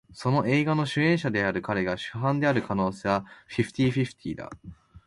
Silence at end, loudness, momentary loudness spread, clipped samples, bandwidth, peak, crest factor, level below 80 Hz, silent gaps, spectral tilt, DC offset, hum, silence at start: 0.1 s; -26 LUFS; 12 LU; under 0.1%; 11.5 kHz; -10 dBFS; 16 dB; -56 dBFS; none; -7 dB/octave; under 0.1%; none; 0.1 s